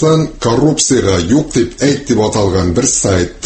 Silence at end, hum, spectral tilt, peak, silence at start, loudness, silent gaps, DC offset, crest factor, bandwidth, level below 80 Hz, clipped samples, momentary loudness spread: 0 s; none; -4.5 dB/octave; 0 dBFS; 0 s; -12 LUFS; none; under 0.1%; 12 dB; 8.8 kHz; -32 dBFS; under 0.1%; 3 LU